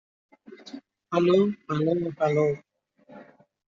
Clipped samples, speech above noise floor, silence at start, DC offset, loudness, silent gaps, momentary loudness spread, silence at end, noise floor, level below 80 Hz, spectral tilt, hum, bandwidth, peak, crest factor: under 0.1%; 31 dB; 0.5 s; under 0.1%; -25 LUFS; none; 23 LU; 0.45 s; -54 dBFS; -66 dBFS; -6.5 dB/octave; none; 7.2 kHz; -8 dBFS; 18 dB